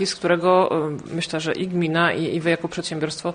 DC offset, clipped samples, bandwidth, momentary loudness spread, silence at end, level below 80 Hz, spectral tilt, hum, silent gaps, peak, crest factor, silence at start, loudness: under 0.1%; under 0.1%; 10 kHz; 9 LU; 0 s; -58 dBFS; -5 dB/octave; none; none; -4 dBFS; 16 dB; 0 s; -22 LUFS